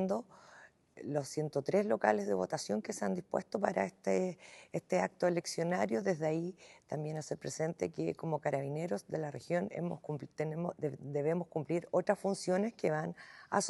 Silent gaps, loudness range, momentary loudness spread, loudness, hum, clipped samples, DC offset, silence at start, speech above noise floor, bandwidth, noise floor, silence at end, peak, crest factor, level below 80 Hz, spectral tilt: none; 3 LU; 8 LU; -36 LUFS; none; under 0.1%; under 0.1%; 0 s; 25 dB; 12 kHz; -60 dBFS; 0 s; -14 dBFS; 22 dB; -80 dBFS; -5.5 dB/octave